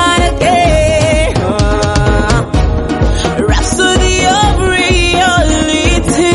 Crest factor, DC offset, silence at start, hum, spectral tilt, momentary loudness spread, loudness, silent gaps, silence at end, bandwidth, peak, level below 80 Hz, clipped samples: 10 dB; under 0.1%; 0 s; none; -4.5 dB/octave; 4 LU; -11 LUFS; none; 0 s; 11.5 kHz; 0 dBFS; -16 dBFS; under 0.1%